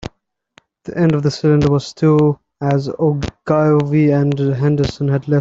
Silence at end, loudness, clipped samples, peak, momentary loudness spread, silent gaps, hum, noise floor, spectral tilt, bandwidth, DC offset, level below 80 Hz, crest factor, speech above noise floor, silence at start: 0 s; -16 LUFS; under 0.1%; 0 dBFS; 7 LU; none; none; -57 dBFS; -8 dB/octave; 7.6 kHz; under 0.1%; -42 dBFS; 16 dB; 42 dB; 0 s